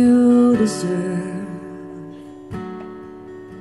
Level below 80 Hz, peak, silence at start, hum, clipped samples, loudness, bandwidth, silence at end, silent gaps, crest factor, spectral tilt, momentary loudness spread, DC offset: -54 dBFS; -6 dBFS; 0 s; none; under 0.1%; -18 LUFS; 11.5 kHz; 0 s; none; 14 dB; -6.5 dB/octave; 23 LU; 0.1%